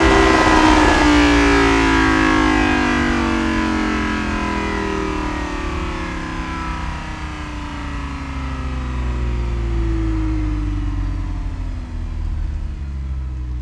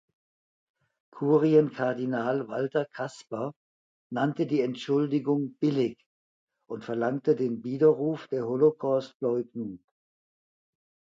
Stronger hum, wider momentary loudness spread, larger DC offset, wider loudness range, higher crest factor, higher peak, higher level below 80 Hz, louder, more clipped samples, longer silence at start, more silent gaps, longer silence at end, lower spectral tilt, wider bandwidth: neither; first, 15 LU vs 12 LU; neither; first, 12 LU vs 3 LU; about the same, 18 dB vs 20 dB; first, 0 dBFS vs -10 dBFS; first, -24 dBFS vs -76 dBFS; first, -19 LUFS vs -28 LUFS; neither; second, 0 s vs 1.15 s; second, none vs 3.56-4.10 s, 6.06-6.47 s, 9.15-9.20 s; second, 0 s vs 1.4 s; second, -5.5 dB/octave vs -8 dB/octave; first, 12 kHz vs 7.6 kHz